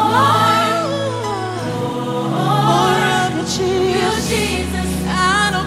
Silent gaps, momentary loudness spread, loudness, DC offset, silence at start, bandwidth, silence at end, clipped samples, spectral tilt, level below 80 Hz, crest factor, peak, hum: none; 8 LU; -16 LUFS; under 0.1%; 0 s; 16 kHz; 0 s; under 0.1%; -4.5 dB/octave; -36 dBFS; 14 dB; -2 dBFS; none